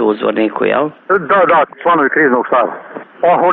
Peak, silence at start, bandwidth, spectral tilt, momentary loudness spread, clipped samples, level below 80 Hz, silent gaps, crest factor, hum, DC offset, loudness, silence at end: 0 dBFS; 0 s; 4.3 kHz; -3.5 dB/octave; 6 LU; under 0.1%; -56 dBFS; none; 12 dB; none; under 0.1%; -13 LUFS; 0 s